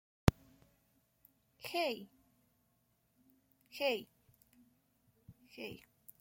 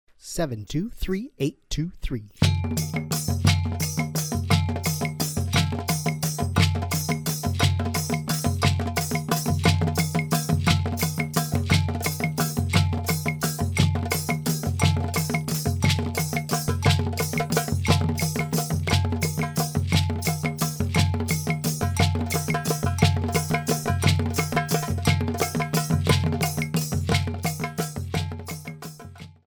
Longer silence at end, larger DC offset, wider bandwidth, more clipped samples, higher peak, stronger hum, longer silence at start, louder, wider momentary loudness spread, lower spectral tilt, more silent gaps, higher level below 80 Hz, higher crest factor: first, 0.45 s vs 0.15 s; neither; second, 16.5 kHz vs over 20 kHz; neither; about the same, -8 dBFS vs -6 dBFS; neither; about the same, 0.25 s vs 0.25 s; second, -39 LUFS vs -25 LUFS; first, 24 LU vs 7 LU; about the same, -5.5 dB/octave vs -5 dB/octave; neither; second, -56 dBFS vs -42 dBFS; first, 34 dB vs 18 dB